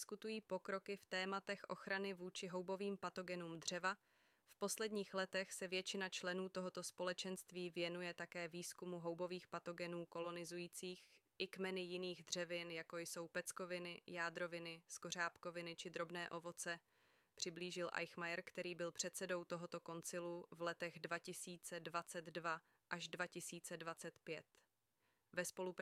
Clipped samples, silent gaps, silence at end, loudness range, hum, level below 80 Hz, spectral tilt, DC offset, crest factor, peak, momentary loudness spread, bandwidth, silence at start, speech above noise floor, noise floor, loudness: under 0.1%; none; 0 s; 3 LU; none; under -90 dBFS; -3 dB/octave; under 0.1%; 22 dB; -28 dBFS; 6 LU; 15.5 kHz; 0 s; 38 dB; -86 dBFS; -48 LUFS